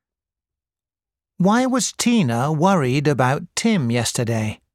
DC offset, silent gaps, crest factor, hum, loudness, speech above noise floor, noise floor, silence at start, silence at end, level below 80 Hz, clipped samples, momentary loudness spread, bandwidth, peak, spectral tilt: under 0.1%; none; 18 dB; none; -19 LUFS; over 71 dB; under -90 dBFS; 1.4 s; 0.2 s; -56 dBFS; under 0.1%; 4 LU; 15.5 kHz; -4 dBFS; -5 dB/octave